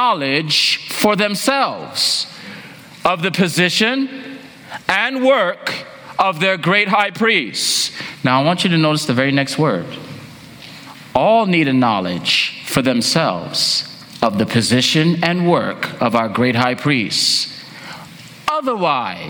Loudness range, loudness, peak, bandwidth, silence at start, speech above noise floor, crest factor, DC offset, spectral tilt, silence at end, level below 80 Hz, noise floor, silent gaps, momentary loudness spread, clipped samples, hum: 2 LU; -16 LUFS; 0 dBFS; over 20 kHz; 0 s; 21 dB; 18 dB; under 0.1%; -4 dB/octave; 0 s; -56 dBFS; -37 dBFS; none; 18 LU; under 0.1%; none